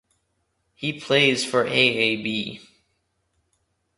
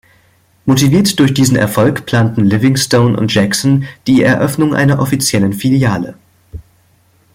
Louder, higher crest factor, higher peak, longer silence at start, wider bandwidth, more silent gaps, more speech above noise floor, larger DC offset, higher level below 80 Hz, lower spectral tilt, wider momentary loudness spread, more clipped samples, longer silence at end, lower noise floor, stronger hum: second, -21 LUFS vs -12 LUFS; first, 22 dB vs 12 dB; second, -4 dBFS vs 0 dBFS; first, 0.8 s vs 0.65 s; second, 11.5 kHz vs 16.5 kHz; neither; first, 50 dB vs 41 dB; neither; second, -66 dBFS vs -44 dBFS; second, -3.5 dB/octave vs -5.5 dB/octave; first, 12 LU vs 4 LU; neither; first, 1.4 s vs 0.75 s; first, -72 dBFS vs -52 dBFS; neither